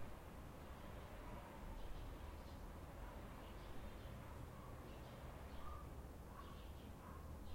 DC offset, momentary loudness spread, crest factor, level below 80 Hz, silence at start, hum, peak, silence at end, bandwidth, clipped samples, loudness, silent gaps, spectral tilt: under 0.1%; 2 LU; 14 dB; -58 dBFS; 0 s; none; -38 dBFS; 0 s; 16.5 kHz; under 0.1%; -56 LUFS; none; -6 dB/octave